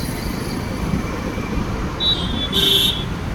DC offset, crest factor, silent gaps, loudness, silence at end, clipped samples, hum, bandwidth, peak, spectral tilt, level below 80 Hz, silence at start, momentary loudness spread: under 0.1%; 16 dB; none; -19 LUFS; 0 s; under 0.1%; none; over 20 kHz; -4 dBFS; -4 dB/octave; -30 dBFS; 0 s; 11 LU